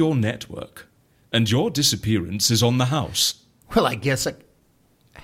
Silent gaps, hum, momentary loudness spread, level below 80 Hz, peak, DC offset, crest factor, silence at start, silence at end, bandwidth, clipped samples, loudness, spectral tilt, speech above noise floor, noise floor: none; none; 15 LU; -48 dBFS; -6 dBFS; under 0.1%; 18 dB; 0 s; 0 s; 16.5 kHz; under 0.1%; -21 LUFS; -4 dB/octave; 39 dB; -61 dBFS